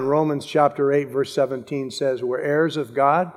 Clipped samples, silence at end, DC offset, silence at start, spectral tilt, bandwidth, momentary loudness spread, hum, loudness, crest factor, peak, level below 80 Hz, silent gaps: under 0.1%; 0 s; under 0.1%; 0 s; -6 dB/octave; 14.5 kHz; 5 LU; none; -22 LUFS; 18 dB; -4 dBFS; -72 dBFS; none